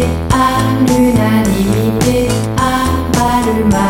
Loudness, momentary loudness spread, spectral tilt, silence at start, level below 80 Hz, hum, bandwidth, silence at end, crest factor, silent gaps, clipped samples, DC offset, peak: -12 LUFS; 3 LU; -6 dB/octave; 0 s; -26 dBFS; none; 17 kHz; 0 s; 12 dB; none; under 0.1%; under 0.1%; 0 dBFS